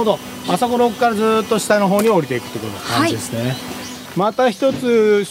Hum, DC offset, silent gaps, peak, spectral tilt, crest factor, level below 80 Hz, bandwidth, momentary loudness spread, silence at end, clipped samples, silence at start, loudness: none; under 0.1%; none; 0 dBFS; -5 dB/octave; 16 dB; -54 dBFS; 16 kHz; 12 LU; 0 s; under 0.1%; 0 s; -17 LUFS